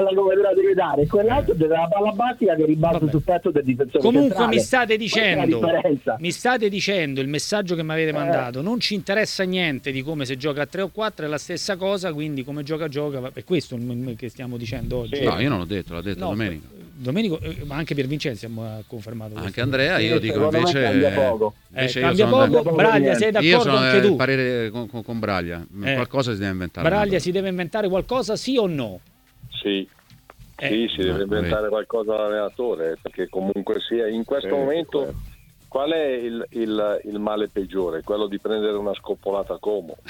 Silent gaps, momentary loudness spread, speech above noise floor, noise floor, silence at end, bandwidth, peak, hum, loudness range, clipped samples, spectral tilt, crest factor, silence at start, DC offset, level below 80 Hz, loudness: none; 12 LU; 27 dB; -48 dBFS; 0 s; 18.5 kHz; -2 dBFS; none; 8 LU; under 0.1%; -5.5 dB/octave; 20 dB; 0 s; under 0.1%; -46 dBFS; -22 LUFS